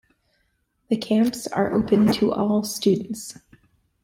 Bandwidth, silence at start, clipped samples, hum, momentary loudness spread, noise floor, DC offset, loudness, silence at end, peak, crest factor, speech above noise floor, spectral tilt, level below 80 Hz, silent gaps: 16.5 kHz; 0.9 s; under 0.1%; none; 11 LU; -70 dBFS; under 0.1%; -22 LUFS; 0.7 s; -8 dBFS; 16 dB; 49 dB; -5.5 dB/octave; -56 dBFS; none